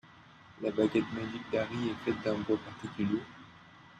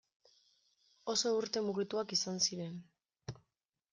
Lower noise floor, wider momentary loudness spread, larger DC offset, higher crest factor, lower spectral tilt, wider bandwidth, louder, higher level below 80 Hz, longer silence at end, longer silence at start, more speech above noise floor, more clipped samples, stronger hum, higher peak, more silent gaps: second, -56 dBFS vs -86 dBFS; second, 13 LU vs 18 LU; neither; about the same, 18 dB vs 20 dB; first, -7 dB/octave vs -3 dB/octave; second, 9 kHz vs 11 kHz; about the same, -34 LUFS vs -35 LUFS; first, -66 dBFS vs -76 dBFS; second, 0 s vs 0.6 s; second, 0.05 s vs 1.05 s; second, 23 dB vs 50 dB; neither; neither; about the same, -16 dBFS vs -18 dBFS; neither